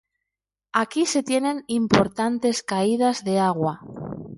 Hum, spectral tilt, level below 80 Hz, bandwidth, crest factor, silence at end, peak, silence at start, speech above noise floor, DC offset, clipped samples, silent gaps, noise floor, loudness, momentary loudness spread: none; -4.5 dB/octave; -56 dBFS; 11.5 kHz; 22 dB; 0 s; 0 dBFS; 0.75 s; 65 dB; under 0.1%; under 0.1%; none; -87 dBFS; -22 LUFS; 7 LU